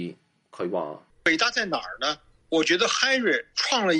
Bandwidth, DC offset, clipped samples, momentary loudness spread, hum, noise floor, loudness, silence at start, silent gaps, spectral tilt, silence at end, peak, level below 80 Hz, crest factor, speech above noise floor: 10.5 kHz; under 0.1%; under 0.1%; 12 LU; none; -44 dBFS; -24 LUFS; 0 s; none; -2.5 dB/octave; 0 s; -4 dBFS; -64 dBFS; 20 dB; 20 dB